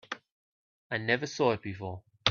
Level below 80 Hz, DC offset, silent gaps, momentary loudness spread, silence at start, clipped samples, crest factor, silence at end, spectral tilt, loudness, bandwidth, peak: -66 dBFS; under 0.1%; 0.32-0.90 s; 14 LU; 0.1 s; under 0.1%; 26 dB; 0 s; -4.5 dB/octave; -31 LUFS; 7.4 kHz; -6 dBFS